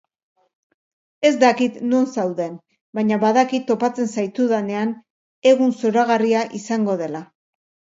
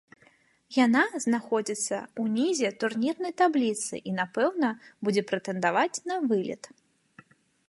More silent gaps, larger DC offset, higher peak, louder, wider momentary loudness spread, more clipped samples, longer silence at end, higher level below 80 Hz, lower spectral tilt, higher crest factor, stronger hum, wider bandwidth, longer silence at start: first, 2.81-2.93 s, 5.10-5.42 s vs none; neither; first, -2 dBFS vs -10 dBFS; first, -19 LUFS vs -27 LUFS; first, 10 LU vs 7 LU; neither; second, 0.7 s vs 1.05 s; first, -72 dBFS vs -78 dBFS; first, -5.5 dB/octave vs -4 dB/octave; about the same, 18 dB vs 18 dB; neither; second, 7.8 kHz vs 11.5 kHz; first, 1.2 s vs 0.7 s